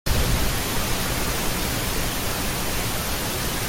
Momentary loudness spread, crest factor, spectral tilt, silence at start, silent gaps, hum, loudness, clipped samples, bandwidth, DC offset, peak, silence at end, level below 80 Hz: 2 LU; 14 dB; -3 dB/octave; 0.05 s; none; none; -24 LUFS; under 0.1%; 17 kHz; under 0.1%; -8 dBFS; 0 s; -30 dBFS